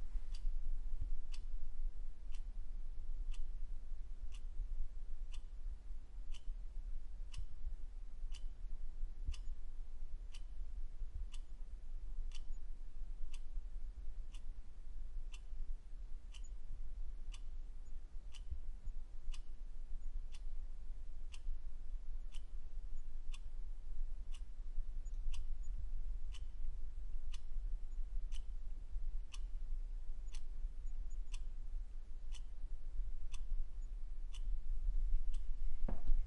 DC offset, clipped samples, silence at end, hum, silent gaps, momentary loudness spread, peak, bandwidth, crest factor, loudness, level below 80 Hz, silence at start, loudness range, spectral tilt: under 0.1%; under 0.1%; 0 s; none; none; 6 LU; -20 dBFS; 6.4 kHz; 18 dB; -52 LUFS; -42 dBFS; 0 s; 4 LU; -5 dB/octave